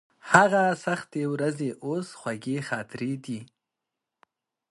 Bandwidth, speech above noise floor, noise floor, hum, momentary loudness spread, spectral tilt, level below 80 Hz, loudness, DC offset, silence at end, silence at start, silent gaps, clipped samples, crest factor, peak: 11.5 kHz; 60 dB; -86 dBFS; none; 15 LU; -5.5 dB/octave; -68 dBFS; -26 LUFS; under 0.1%; 1.25 s; 0.25 s; none; under 0.1%; 26 dB; 0 dBFS